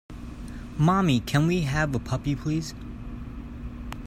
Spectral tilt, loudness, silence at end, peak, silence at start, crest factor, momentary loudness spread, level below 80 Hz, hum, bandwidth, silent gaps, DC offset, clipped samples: -6.5 dB/octave; -25 LUFS; 0 s; -10 dBFS; 0.1 s; 18 dB; 17 LU; -40 dBFS; none; 15 kHz; none; under 0.1%; under 0.1%